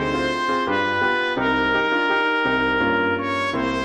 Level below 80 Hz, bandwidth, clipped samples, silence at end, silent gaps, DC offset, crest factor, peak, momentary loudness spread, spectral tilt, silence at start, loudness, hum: -46 dBFS; 11 kHz; under 0.1%; 0 s; none; under 0.1%; 12 dB; -8 dBFS; 3 LU; -5 dB/octave; 0 s; -20 LUFS; none